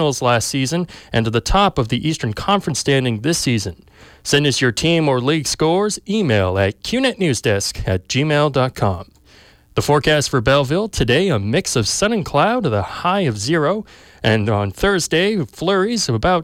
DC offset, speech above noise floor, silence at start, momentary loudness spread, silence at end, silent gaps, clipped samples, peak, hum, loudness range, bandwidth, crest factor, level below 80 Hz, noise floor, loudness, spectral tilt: under 0.1%; 31 dB; 0 s; 6 LU; 0 s; none; under 0.1%; -4 dBFS; none; 2 LU; 16.5 kHz; 14 dB; -38 dBFS; -48 dBFS; -17 LUFS; -4.5 dB/octave